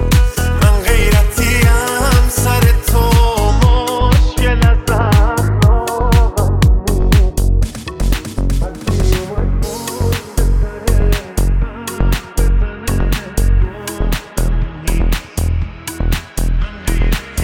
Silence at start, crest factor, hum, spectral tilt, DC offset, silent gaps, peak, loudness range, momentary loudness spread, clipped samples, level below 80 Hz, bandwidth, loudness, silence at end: 0 s; 12 dB; none; -5.5 dB/octave; under 0.1%; none; 0 dBFS; 6 LU; 8 LU; under 0.1%; -14 dBFS; 17.5 kHz; -15 LUFS; 0 s